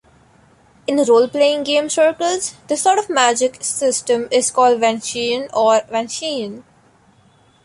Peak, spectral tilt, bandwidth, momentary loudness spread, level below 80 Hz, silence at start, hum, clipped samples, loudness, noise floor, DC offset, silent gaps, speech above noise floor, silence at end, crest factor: -2 dBFS; -2 dB/octave; 11.5 kHz; 9 LU; -62 dBFS; 0.9 s; none; under 0.1%; -17 LUFS; -53 dBFS; under 0.1%; none; 36 dB; 1.05 s; 16 dB